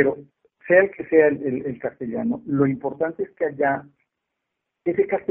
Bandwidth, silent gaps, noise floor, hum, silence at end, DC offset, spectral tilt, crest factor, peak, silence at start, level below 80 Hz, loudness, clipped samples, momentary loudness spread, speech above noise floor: 3.4 kHz; none; -80 dBFS; none; 0.1 s; under 0.1%; -2.5 dB/octave; 20 dB; -4 dBFS; 0 s; -62 dBFS; -22 LUFS; under 0.1%; 12 LU; 59 dB